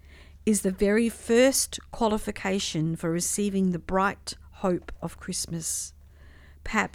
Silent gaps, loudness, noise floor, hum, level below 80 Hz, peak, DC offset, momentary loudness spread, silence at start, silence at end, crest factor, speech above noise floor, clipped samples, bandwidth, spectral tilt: none; -26 LUFS; -50 dBFS; none; -46 dBFS; -8 dBFS; under 0.1%; 11 LU; 0.2 s; 0.05 s; 20 dB; 24 dB; under 0.1%; 17 kHz; -4 dB/octave